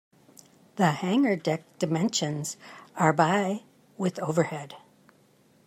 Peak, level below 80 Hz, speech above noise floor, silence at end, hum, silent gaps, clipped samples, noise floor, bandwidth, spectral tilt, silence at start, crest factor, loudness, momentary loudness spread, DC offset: -8 dBFS; -74 dBFS; 35 dB; 0.9 s; none; none; under 0.1%; -61 dBFS; 15 kHz; -5 dB/octave; 0.75 s; 20 dB; -27 LUFS; 15 LU; under 0.1%